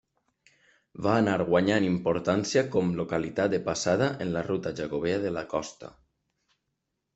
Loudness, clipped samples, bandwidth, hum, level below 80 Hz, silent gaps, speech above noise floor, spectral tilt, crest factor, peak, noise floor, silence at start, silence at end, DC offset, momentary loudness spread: -27 LUFS; under 0.1%; 8.2 kHz; none; -60 dBFS; none; 54 dB; -5.5 dB/octave; 20 dB; -8 dBFS; -81 dBFS; 0.95 s; 1.25 s; under 0.1%; 8 LU